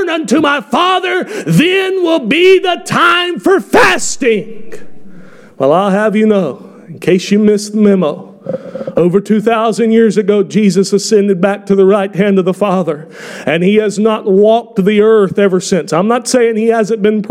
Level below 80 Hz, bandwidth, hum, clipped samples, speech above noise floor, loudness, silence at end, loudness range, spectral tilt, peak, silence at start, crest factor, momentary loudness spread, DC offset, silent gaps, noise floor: -52 dBFS; 15 kHz; none; under 0.1%; 24 dB; -11 LUFS; 0 s; 3 LU; -5 dB/octave; 0 dBFS; 0 s; 10 dB; 8 LU; under 0.1%; none; -35 dBFS